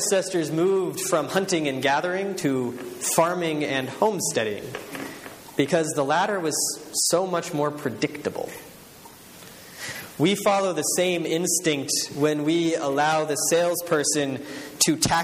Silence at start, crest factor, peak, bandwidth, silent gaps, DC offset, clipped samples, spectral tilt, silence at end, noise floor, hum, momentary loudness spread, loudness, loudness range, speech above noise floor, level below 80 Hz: 0 s; 20 dB; -4 dBFS; 15.5 kHz; none; under 0.1%; under 0.1%; -3.5 dB/octave; 0 s; -46 dBFS; none; 13 LU; -24 LUFS; 4 LU; 22 dB; -60 dBFS